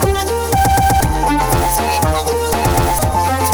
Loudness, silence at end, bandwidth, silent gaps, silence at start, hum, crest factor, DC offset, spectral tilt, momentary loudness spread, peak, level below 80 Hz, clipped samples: -15 LUFS; 0 s; over 20 kHz; none; 0 s; none; 14 dB; under 0.1%; -4.5 dB/octave; 4 LU; 0 dBFS; -22 dBFS; under 0.1%